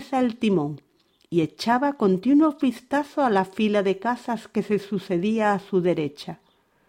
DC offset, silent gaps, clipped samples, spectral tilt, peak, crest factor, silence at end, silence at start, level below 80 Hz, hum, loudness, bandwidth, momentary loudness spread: under 0.1%; none; under 0.1%; -7 dB/octave; -8 dBFS; 16 dB; 0.55 s; 0 s; -66 dBFS; none; -23 LUFS; 15.5 kHz; 9 LU